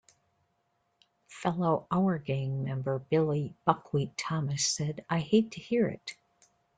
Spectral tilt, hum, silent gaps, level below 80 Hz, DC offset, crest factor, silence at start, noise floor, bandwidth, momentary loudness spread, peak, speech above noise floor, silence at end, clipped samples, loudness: -5.5 dB/octave; none; none; -68 dBFS; under 0.1%; 24 dB; 1.3 s; -76 dBFS; 9.4 kHz; 6 LU; -8 dBFS; 46 dB; 0.65 s; under 0.1%; -30 LUFS